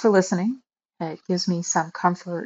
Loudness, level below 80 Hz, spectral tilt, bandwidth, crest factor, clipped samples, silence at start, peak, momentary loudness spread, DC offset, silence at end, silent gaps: -24 LUFS; -72 dBFS; -5 dB/octave; 8 kHz; 18 dB; under 0.1%; 0 s; -4 dBFS; 13 LU; under 0.1%; 0 s; none